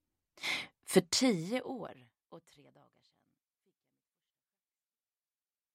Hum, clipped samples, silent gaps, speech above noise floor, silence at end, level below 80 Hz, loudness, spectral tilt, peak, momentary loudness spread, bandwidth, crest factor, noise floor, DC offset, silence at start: none; under 0.1%; none; over 56 dB; 3.35 s; -78 dBFS; -33 LUFS; -3.5 dB/octave; -12 dBFS; 15 LU; 16 kHz; 26 dB; under -90 dBFS; under 0.1%; 0.4 s